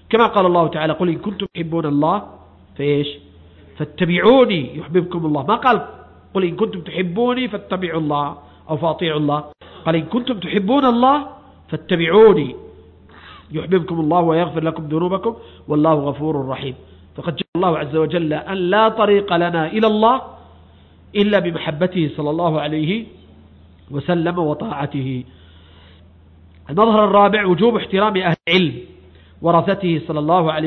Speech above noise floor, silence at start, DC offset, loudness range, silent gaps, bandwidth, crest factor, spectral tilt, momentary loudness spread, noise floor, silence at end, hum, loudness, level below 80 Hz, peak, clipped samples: 29 dB; 0.1 s; under 0.1%; 5 LU; 17.48-17.53 s; 6 kHz; 16 dB; -9 dB/octave; 13 LU; -46 dBFS; 0 s; none; -18 LUFS; -50 dBFS; -2 dBFS; under 0.1%